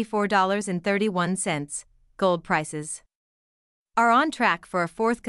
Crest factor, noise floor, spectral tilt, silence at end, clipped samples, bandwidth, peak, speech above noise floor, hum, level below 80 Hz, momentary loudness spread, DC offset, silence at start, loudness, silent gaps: 18 dB; under -90 dBFS; -4.5 dB/octave; 0 s; under 0.1%; 12 kHz; -8 dBFS; over 66 dB; none; -62 dBFS; 13 LU; under 0.1%; 0 s; -24 LUFS; 3.15-3.86 s